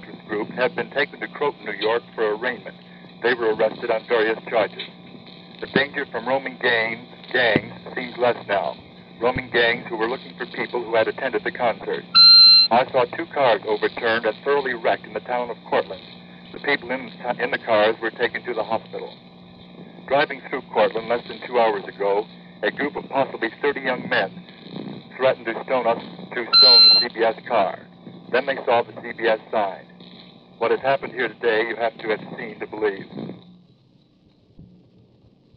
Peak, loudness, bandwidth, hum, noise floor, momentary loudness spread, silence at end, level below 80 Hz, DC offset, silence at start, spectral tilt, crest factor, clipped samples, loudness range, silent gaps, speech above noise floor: -2 dBFS; -19 LUFS; 5.8 kHz; none; -57 dBFS; 14 LU; 0.9 s; -62 dBFS; under 0.1%; 0 s; -6.5 dB/octave; 20 dB; under 0.1%; 11 LU; none; 35 dB